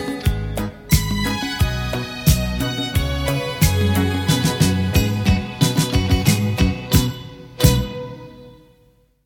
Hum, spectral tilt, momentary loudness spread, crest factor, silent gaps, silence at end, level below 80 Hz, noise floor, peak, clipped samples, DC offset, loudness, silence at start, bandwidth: none; -5 dB/octave; 9 LU; 20 dB; none; 0.7 s; -28 dBFS; -56 dBFS; 0 dBFS; under 0.1%; under 0.1%; -19 LUFS; 0 s; 17.5 kHz